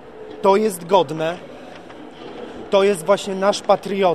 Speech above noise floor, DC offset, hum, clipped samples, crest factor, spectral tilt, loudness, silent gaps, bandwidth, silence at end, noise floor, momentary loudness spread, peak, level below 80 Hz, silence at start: 21 dB; 0.4%; none; under 0.1%; 18 dB; -4.5 dB/octave; -19 LUFS; none; 14.5 kHz; 0 s; -38 dBFS; 21 LU; -2 dBFS; -58 dBFS; 0.05 s